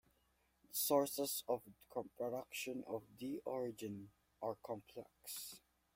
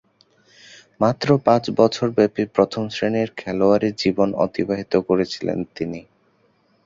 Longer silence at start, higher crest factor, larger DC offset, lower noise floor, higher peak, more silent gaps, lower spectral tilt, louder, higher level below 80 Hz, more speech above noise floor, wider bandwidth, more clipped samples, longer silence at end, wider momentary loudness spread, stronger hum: second, 0.7 s vs 1 s; about the same, 24 dB vs 20 dB; neither; first, -79 dBFS vs -61 dBFS; second, -22 dBFS vs -2 dBFS; neither; second, -3.5 dB/octave vs -6.5 dB/octave; second, -43 LUFS vs -20 LUFS; second, -80 dBFS vs -54 dBFS; second, 35 dB vs 42 dB; first, 16.5 kHz vs 7.8 kHz; neither; second, 0.4 s vs 0.85 s; first, 16 LU vs 9 LU; neither